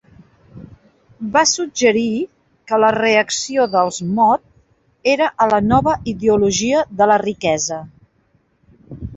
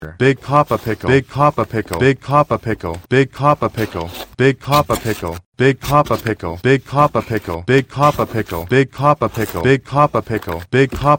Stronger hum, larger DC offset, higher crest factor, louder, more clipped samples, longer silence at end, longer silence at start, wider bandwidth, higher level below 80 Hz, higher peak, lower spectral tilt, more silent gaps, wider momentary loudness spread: neither; neither; about the same, 18 dB vs 16 dB; about the same, -16 LUFS vs -16 LUFS; neither; about the same, 0 s vs 0 s; first, 0.55 s vs 0 s; second, 8.2 kHz vs 17 kHz; about the same, -46 dBFS vs -42 dBFS; about the same, 0 dBFS vs 0 dBFS; second, -3.5 dB/octave vs -6.5 dB/octave; second, none vs 5.46-5.52 s; about the same, 7 LU vs 9 LU